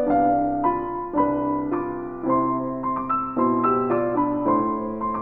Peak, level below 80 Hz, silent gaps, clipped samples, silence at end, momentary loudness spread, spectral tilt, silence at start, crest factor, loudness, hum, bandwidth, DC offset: -6 dBFS; -48 dBFS; none; under 0.1%; 0 s; 6 LU; -11.5 dB/octave; 0 s; 16 dB; -23 LUFS; none; 3.2 kHz; under 0.1%